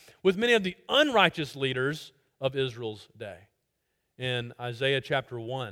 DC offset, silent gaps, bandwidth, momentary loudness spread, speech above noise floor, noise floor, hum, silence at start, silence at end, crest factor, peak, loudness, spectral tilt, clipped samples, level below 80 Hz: under 0.1%; none; 16.5 kHz; 16 LU; 50 dB; -79 dBFS; none; 0.25 s; 0 s; 24 dB; -6 dBFS; -27 LUFS; -5 dB/octave; under 0.1%; -66 dBFS